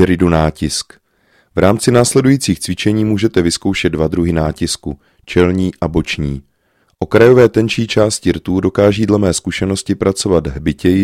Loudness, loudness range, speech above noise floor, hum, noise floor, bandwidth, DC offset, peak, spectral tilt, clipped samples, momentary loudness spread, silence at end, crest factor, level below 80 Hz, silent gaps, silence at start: -14 LUFS; 4 LU; 46 dB; none; -59 dBFS; 16 kHz; under 0.1%; 0 dBFS; -5.5 dB/octave; 0.1%; 9 LU; 0 s; 14 dB; -34 dBFS; none; 0 s